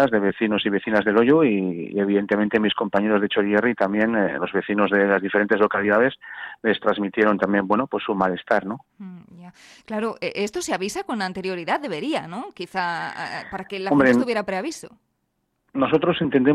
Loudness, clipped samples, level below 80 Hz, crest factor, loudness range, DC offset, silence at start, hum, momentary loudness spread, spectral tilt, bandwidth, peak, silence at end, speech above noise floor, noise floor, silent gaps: -22 LUFS; under 0.1%; -60 dBFS; 16 dB; 7 LU; under 0.1%; 0 s; none; 13 LU; -5.5 dB/octave; 12.5 kHz; -6 dBFS; 0 s; 52 dB; -73 dBFS; none